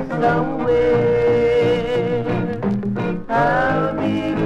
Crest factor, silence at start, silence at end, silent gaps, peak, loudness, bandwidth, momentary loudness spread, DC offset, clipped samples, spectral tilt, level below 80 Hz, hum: 12 dB; 0 s; 0 s; none; -6 dBFS; -18 LUFS; 8 kHz; 6 LU; under 0.1%; under 0.1%; -8 dB/octave; -40 dBFS; none